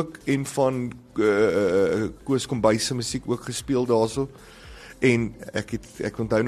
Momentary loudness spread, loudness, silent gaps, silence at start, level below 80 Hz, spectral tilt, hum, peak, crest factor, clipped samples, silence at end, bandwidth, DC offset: 11 LU; -24 LUFS; none; 0 s; -50 dBFS; -5.5 dB/octave; none; -6 dBFS; 18 dB; under 0.1%; 0 s; 13 kHz; under 0.1%